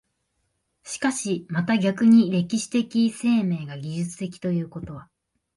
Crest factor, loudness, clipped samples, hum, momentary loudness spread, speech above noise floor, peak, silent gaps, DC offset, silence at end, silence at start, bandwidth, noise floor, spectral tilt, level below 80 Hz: 16 dB; -23 LUFS; under 0.1%; none; 17 LU; 51 dB; -8 dBFS; none; under 0.1%; 0.55 s; 0.85 s; 11.5 kHz; -74 dBFS; -5.5 dB/octave; -60 dBFS